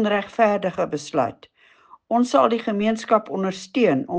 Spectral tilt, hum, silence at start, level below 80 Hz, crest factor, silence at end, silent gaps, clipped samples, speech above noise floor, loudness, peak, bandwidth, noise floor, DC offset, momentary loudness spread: -5.5 dB/octave; none; 0 s; -64 dBFS; 18 dB; 0 s; none; under 0.1%; 31 dB; -22 LUFS; -4 dBFS; 9.6 kHz; -52 dBFS; under 0.1%; 8 LU